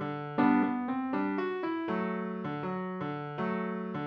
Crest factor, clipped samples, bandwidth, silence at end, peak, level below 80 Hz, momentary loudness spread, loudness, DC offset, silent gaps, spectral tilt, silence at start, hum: 18 dB; under 0.1%; 5.6 kHz; 0 s; -14 dBFS; -74 dBFS; 9 LU; -32 LUFS; under 0.1%; none; -9.5 dB/octave; 0 s; none